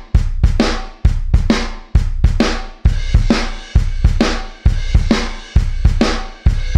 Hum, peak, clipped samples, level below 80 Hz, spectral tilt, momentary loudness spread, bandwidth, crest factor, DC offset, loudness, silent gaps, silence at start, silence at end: none; 0 dBFS; under 0.1%; -16 dBFS; -6 dB/octave; 4 LU; 9.4 kHz; 14 dB; under 0.1%; -17 LUFS; none; 0 s; 0 s